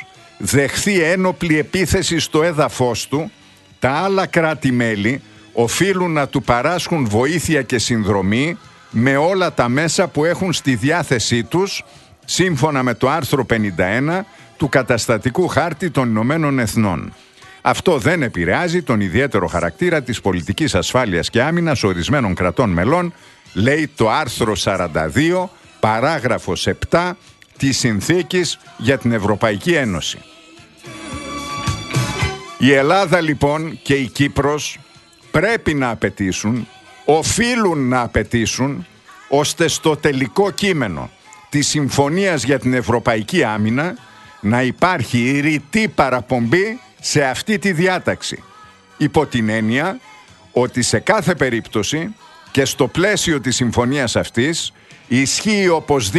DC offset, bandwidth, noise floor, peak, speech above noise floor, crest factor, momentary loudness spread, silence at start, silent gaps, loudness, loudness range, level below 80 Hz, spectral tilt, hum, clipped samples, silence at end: under 0.1%; 12.5 kHz; -44 dBFS; 0 dBFS; 27 dB; 18 dB; 7 LU; 0 s; none; -17 LUFS; 2 LU; -42 dBFS; -4.5 dB/octave; none; under 0.1%; 0 s